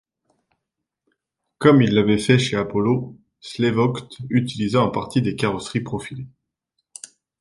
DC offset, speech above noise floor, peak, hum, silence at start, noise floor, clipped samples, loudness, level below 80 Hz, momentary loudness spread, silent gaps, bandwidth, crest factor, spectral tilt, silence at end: under 0.1%; 62 dB; -2 dBFS; none; 1.6 s; -82 dBFS; under 0.1%; -20 LUFS; -54 dBFS; 22 LU; none; 11.5 kHz; 20 dB; -6.5 dB/octave; 1.15 s